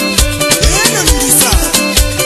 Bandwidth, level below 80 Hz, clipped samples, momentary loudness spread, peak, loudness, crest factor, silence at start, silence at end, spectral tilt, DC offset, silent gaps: 15.5 kHz; -16 dBFS; 0.2%; 4 LU; 0 dBFS; -9 LUFS; 10 dB; 0 s; 0 s; -2.5 dB/octave; under 0.1%; none